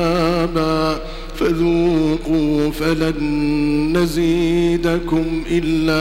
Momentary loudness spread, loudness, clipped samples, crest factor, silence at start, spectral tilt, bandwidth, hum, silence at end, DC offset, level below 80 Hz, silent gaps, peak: 3 LU; -18 LUFS; under 0.1%; 14 dB; 0 s; -6.5 dB/octave; 15.5 kHz; none; 0 s; under 0.1%; -30 dBFS; none; -4 dBFS